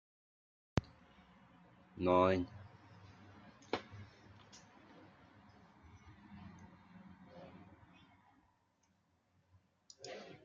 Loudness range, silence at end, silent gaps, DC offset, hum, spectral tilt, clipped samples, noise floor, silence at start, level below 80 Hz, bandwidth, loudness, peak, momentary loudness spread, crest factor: 21 LU; 0.1 s; none; under 0.1%; none; -5.5 dB/octave; under 0.1%; -77 dBFS; 0.75 s; -68 dBFS; 7.4 kHz; -37 LUFS; -16 dBFS; 29 LU; 28 dB